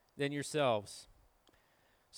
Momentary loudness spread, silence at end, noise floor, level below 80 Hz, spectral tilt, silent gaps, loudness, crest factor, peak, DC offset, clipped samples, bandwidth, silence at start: 18 LU; 0 s; -72 dBFS; -74 dBFS; -4.5 dB/octave; none; -36 LUFS; 20 dB; -20 dBFS; under 0.1%; under 0.1%; over 20 kHz; 0.15 s